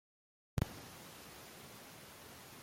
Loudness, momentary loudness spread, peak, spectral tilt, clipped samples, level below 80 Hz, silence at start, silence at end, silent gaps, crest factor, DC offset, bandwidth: -48 LUFS; 12 LU; -20 dBFS; -5 dB/octave; under 0.1%; -58 dBFS; 0.55 s; 0 s; none; 28 dB; under 0.1%; 16.5 kHz